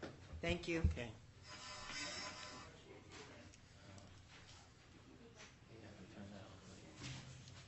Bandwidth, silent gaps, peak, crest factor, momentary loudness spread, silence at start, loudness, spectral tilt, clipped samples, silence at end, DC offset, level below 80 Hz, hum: 8.2 kHz; none; -26 dBFS; 24 dB; 20 LU; 0 s; -48 LUFS; -4.5 dB/octave; under 0.1%; 0 s; under 0.1%; -56 dBFS; none